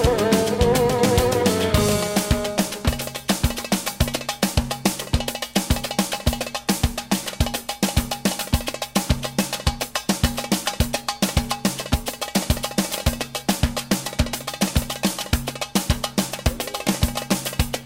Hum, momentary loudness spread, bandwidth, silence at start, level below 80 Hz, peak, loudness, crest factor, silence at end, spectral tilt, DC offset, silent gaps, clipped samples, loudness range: none; 6 LU; 16.5 kHz; 0 s; -30 dBFS; -6 dBFS; -23 LUFS; 16 dB; 0 s; -4 dB/octave; under 0.1%; none; under 0.1%; 3 LU